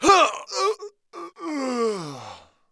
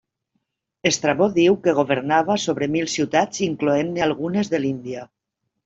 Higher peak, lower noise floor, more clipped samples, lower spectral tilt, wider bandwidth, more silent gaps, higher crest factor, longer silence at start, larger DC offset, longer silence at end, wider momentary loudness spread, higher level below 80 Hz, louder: about the same, -2 dBFS vs -4 dBFS; second, -44 dBFS vs -74 dBFS; neither; second, -2.5 dB/octave vs -4.5 dB/octave; first, 11 kHz vs 8 kHz; neither; about the same, 20 dB vs 18 dB; second, 0 s vs 0.85 s; neither; second, 0.35 s vs 0.6 s; first, 22 LU vs 7 LU; about the same, -56 dBFS vs -60 dBFS; second, -23 LUFS vs -20 LUFS